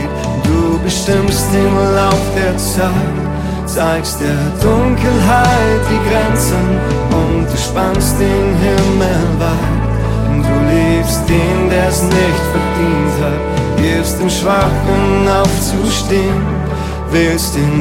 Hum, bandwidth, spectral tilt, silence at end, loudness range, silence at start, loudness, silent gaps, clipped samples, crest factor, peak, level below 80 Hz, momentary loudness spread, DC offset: none; 16.5 kHz; -5.5 dB/octave; 0 s; 1 LU; 0 s; -13 LUFS; none; under 0.1%; 12 dB; 0 dBFS; -22 dBFS; 4 LU; under 0.1%